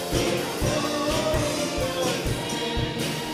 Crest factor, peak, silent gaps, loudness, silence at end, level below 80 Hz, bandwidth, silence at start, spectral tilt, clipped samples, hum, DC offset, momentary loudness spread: 16 dB; -10 dBFS; none; -25 LUFS; 0 s; -38 dBFS; 16 kHz; 0 s; -4 dB/octave; under 0.1%; none; under 0.1%; 3 LU